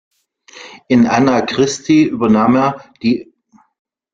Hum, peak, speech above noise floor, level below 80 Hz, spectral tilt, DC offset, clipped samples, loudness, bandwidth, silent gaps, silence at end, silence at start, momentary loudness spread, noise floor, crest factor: none; 0 dBFS; 30 dB; -52 dBFS; -5.5 dB/octave; under 0.1%; under 0.1%; -14 LUFS; 7.6 kHz; none; 0.9 s; 0.55 s; 9 LU; -42 dBFS; 14 dB